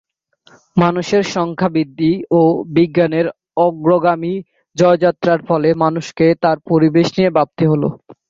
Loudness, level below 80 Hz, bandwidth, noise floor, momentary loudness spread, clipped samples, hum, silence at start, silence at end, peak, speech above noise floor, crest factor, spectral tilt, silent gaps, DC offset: -15 LUFS; -54 dBFS; 7.6 kHz; -52 dBFS; 6 LU; under 0.1%; none; 0.75 s; 0.15 s; -2 dBFS; 38 dB; 14 dB; -7 dB/octave; none; under 0.1%